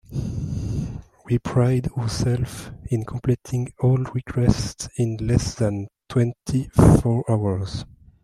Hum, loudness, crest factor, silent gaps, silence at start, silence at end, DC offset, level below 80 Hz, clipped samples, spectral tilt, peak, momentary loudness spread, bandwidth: none; -23 LUFS; 20 dB; none; 0.1 s; 0.4 s; under 0.1%; -36 dBFS; under 0.1%; -7 dB/octave; -2 dBFS; 11 LU; 13 kHz